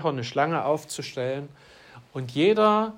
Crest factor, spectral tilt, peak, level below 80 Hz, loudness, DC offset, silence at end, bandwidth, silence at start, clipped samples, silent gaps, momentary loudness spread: 16 dB; -5.5 dB/octave; -10 dBFS; -70 dBFS; -25 LUFS; under 0.1%; 0 s; 16 kHz; 0 s; under 0.1%; none; 16 LU